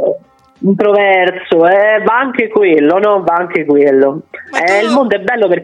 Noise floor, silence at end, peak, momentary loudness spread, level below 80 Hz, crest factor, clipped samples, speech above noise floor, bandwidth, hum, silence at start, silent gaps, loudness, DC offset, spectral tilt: -33 dBFS; 0 s; 0 dBFS; 7 LU; -58 dBFS; 10 dB; under 0.1%; 22 dB; 10 kHz; none; 0 s; none; -11 LUFS; under 0.1%; -6 dB/octave